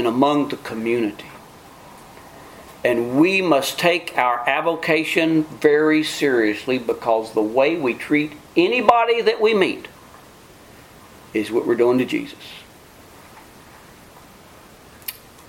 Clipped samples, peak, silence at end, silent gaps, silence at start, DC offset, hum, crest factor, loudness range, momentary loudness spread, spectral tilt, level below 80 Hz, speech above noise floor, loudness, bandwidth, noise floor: under 0.1%; 0 dBFS; 0.3 s; none; 0 s; under 0.1%; none; 20 dB; 6 LU; 17 LU; -5 dB/octave; -58 dBFS; 27 dB; -19 LUFS; 17 kHz; -45 dBFS